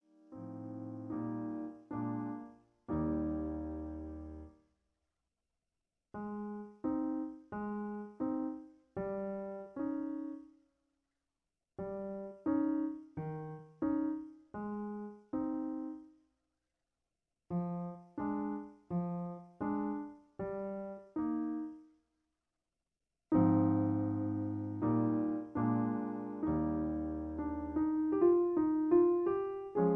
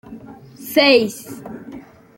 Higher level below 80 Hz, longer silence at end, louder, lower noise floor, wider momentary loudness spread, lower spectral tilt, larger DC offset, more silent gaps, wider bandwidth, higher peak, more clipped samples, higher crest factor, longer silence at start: about the same, -60 dBFS vs -60 dBFS; second, 0 s vs 0.4 s; second, -37 LUFS vs -15 LUFS; first, under -90 dBFS vs -39 dBFS; second, 16 LU vs 25 LU; first, -12 dB/octave vs -3.5 dB/octave; neither; neither; second, 3 kHz vs 17 kHz; second, -18 dBFS vs -2 dBFS; neither; about the same, 20 dB vs 18 dB; first, 0.3 s vs 0.1 s